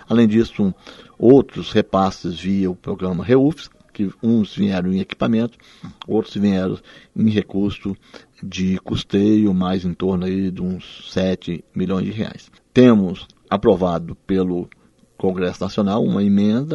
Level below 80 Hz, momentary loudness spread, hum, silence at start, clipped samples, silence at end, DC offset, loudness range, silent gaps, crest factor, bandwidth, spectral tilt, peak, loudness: -48 dBFS; 13 LU; none; 0.1 s; under 0.1%; 0 s; under 0.1%; 4 LU; none; 18 dB; 7.4 kHz; -8 dB/octave; 0 dBFS; -19 LUFS